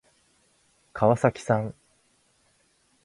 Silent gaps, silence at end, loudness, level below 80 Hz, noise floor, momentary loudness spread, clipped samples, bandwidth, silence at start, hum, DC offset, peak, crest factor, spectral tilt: none; 1.35 s; -25 LUFS; -60 dBFS; -66 dBFS; 15 LU; under 0.1%; 11.5 kHz; 0.95 s; none; under 0.1%; -6 dBFS; 22 dB; -7.5 dB/octave